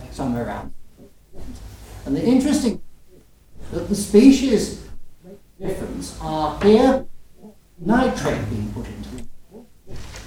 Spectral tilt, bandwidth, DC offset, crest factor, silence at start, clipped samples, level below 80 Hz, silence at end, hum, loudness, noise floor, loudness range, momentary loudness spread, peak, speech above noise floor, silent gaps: -6 dB/octave; 16 kHz; under 0.1%; 20 dB; 0 s; under 0.1%; -40 dBFS; 0 s; none; -19 LUFS; -48 dBFS; 6 LU; 25 LU; 0 dBFS; 29 dB; none